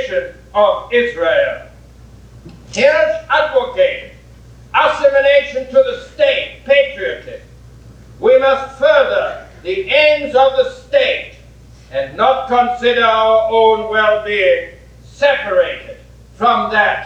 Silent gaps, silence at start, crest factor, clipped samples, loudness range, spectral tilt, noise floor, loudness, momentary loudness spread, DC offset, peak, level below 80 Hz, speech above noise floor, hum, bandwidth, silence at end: none; 0 s; 14 dB; under 0.1%; 3 LU; -4 dB/octave; -40 dBFS; -14 LUFS; 11 LU; under 0.1%; 0 dBFS; -44 dBFS; 26 dB; none; 8.6 kHz; 0 s